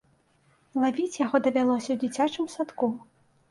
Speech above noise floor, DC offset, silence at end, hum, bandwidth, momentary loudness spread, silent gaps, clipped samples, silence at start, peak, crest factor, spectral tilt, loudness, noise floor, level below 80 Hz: 39 dB; under 0.1%; 0.5 s; none; 11.5 kHz; 7 LU; none; under 0.1%; 0.75 s; -10 dBFS; 18 dB; -4.5 dB/octave; -27 LUFS; -65 dBFS; -70 dBFS